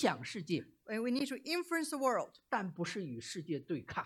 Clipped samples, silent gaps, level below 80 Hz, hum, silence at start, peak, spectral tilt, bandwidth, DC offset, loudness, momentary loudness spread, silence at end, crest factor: under 0.1%; none; -76 dBFS; none; 0 s; -18 dBFS; -4.5 dB/octave; 17 kHz; under 0.1%; -38 LUFS; 8 LU; 0 s; 20 dB